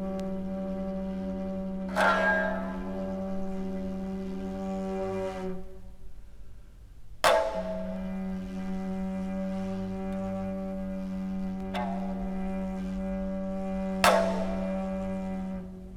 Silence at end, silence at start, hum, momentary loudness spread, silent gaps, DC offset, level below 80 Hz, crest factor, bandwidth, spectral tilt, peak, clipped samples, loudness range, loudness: 0 s; 0 s; none; 11 LU; none; under 0.1%; -46 dBFS; 26 dB; 17 kHz; -5.5 dB/octave; -4 dBFS; under 0.1%; 5 LU; -31 LUFS